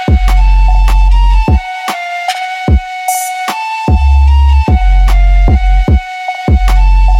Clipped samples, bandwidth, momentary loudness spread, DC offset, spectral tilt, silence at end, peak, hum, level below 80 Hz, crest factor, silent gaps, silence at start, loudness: under 0.1%; 14 kHz; 7 LU; under 0.1%; -5.5 dB/octave; 0 s; 0 dBFS; none; -8 dBFS; 6 dB; none; 0 s; -11 LUFS